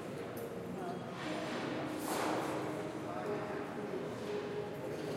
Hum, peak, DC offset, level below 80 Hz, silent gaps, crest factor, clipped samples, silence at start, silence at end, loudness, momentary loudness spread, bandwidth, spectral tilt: none; -24 dBFS; under 0.1%; -74 dBFS; none; 16 dB; under 0.1%; 0 s; 0 s; -40 LUFS; 6 LU; 16 kHz; -5 dB/octave